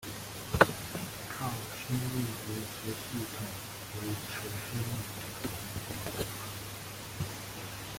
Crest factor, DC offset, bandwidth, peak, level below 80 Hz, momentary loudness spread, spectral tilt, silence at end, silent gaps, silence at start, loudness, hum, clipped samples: 30 dB; under 0.1%; 17 kHz; -6 dBFS; -56 dBFS; 9 LU; -4 dB/octave; 0 s; none; 0 s; -36 LUFS; none; under 0.1%